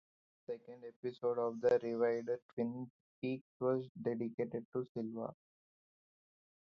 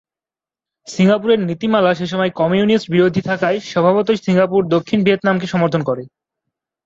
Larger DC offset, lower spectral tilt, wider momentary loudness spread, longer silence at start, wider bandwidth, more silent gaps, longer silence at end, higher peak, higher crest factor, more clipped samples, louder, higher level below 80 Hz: neither; about the same, -7 dB/octave vs -6.5 dB/octave; first, 15 LU vs 4 LU; second, 0.5 s vs 0.85 s; second, 6.8 kHz vs 7.8 kHz; first, 0.96-1.03 s, 2.42-2.57 s, 2.90-3.22 s, 3.41-3.60 s, 3.89-3.95 s, 4.34-4.38 s, 4.65-4.72 s, 4.89-4.95 s vs none; first, 1.4 s vs 0.8 s; second, -20 dBFS vs -2 dBFS; first, 20 dB vs 14 dB; neither; second, -39 LUFS vs -16 LUFS; second, -82 dBFS vs -56 dBFS